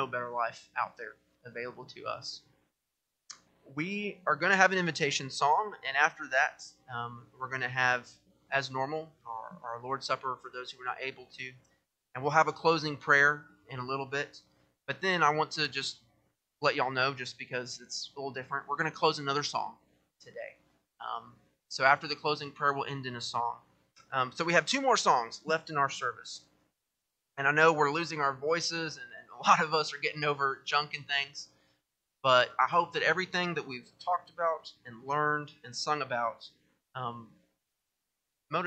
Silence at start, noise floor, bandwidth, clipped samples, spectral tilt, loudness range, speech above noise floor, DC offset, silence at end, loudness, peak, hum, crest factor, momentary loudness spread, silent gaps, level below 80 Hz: 0 s; -85 dBFS; 9.2 kHz; under 0.1%; -3.5 dB/octave; 7 LU; 54 dB; under 0.1%; 0 s; -30 LUFS; -8 dBFS; none; 26 dB; 18 LU; none; -78 dBFS